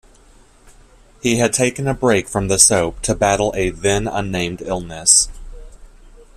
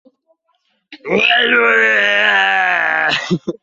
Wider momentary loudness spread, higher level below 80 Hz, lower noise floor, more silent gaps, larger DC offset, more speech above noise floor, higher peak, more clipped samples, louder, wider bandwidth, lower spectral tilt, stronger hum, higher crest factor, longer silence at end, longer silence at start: first, 11 LU vs 8 LU; first, -36 dBFS vs -60 dBFS; second, -48 dBFS vs -64 dBFS; neither; neither; second, 31 dB vs 51 dB; about the same, 0 dBFS vs 0 dBFS; neither; second, -16 LUFS vs -12 LUFS; first, 16 kHz vs 7.8 kHz; about the same, -3 dB/octave vs -4 dB/octave; neither; about the same, 18 dB vs 14 dB; first, 0.25 s vs 0.1 s; second, 0.65 s vs 0.9 s